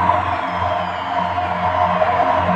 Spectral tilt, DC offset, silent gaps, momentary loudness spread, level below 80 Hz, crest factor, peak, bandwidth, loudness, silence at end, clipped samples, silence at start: -6.5 dB/octave; under 0.1%; none; 5 LU; -46 dBFS; 16 dB; -2 dBFS; 8.8 kHz; -19 LUFS; 0 s; under 0.1%; 0 s